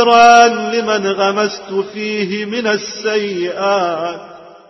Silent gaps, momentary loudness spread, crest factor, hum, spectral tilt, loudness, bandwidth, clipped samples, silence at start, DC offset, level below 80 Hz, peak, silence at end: none; 14 LU; 14 dB; none; -3.5 dB/octave; -14 LUFS; 8 kHz; under 0.1%; 0 s; under 0.1%; -60 dBFS; 0 dBFS; 0.2 s